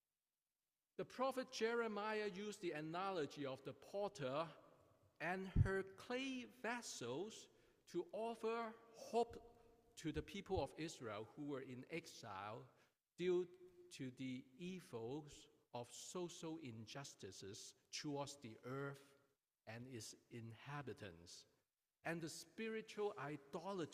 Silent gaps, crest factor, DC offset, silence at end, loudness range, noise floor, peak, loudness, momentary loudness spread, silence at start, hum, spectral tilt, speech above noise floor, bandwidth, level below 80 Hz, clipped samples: none; 24 dB; under 0.1%; 0 s; 7 LU; under -90 dBFS; -26 dBFS; -48 LUFS; 13 LU; 1 s; none; -5 dB/octave; over 42 dB; 15.5 kHz; -64 dBFS; under 0.1%